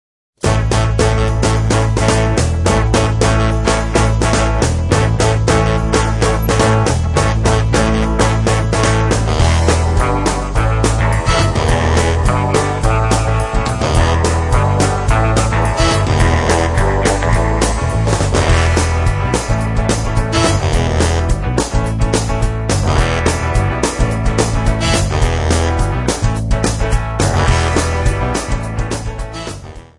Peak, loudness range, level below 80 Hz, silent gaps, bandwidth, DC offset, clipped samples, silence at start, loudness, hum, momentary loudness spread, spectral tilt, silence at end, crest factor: 0 dBFS; 2 LU; -20 dBFS; none; 12 kHz; under 0.1%; under 0.1%; 0.45 s; -15 LUFS; none; 4 LU; -5 dB/octave; 0.15 s; 14 dB